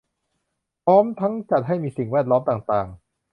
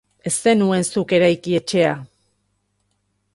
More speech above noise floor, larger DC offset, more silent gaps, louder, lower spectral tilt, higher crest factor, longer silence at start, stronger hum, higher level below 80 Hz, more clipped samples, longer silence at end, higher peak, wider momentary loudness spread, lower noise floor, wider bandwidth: first, 57 dB vs 51 dB; neither; neither; second, -21 LUFS vs -18 LUFS; first, -10 dB/octave vs -4.5 dB/octave; about the same, 18 dB vs 16 dB; first, 0.85 s vs 0.25 s; second, none vs 50 Hz at -45 dBFS; about the same, -56 dBFS vs -60 dBFS; neither; second, 0.4 s vs 1.3 s; about the same, -4 dBFS vs -4 dBFS; first, 8 LU vs 5 LU; first, -77 dBFS vs -69 dBFS; second, 5.4 kHz vs 11.5 kHz